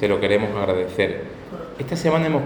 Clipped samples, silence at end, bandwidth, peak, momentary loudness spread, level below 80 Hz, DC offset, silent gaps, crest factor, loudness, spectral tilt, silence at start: under 0.1%; 0 s; over 20 kHz; -4 dBFS; 15 LU; -50 dBFS; under 0.1%; none; 18 dB; -22 LUFS; -6.5 dB/octave; 0 s